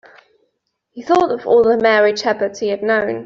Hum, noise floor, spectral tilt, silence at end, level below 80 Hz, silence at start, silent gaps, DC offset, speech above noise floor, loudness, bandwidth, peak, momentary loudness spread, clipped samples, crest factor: none; -71 dBFS; -4.5 dB/octave; 0 s; -58 dBFS; 0.95 s; none; under 0.1%; 55 dB; -15 LUFS; 7.6 kHz; -2 dBFS; 7 LU; under 0.1%; 14 dB